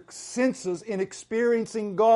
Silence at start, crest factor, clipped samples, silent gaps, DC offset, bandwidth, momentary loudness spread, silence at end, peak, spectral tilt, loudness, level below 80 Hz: 0.1 s; 16 dB; under 0.1%; none; under 0.1%; 11.5 kHz; 7 LU; 0 s; -10 dBFS; -5 dB/octave; -27 LUFS; -70 dBFS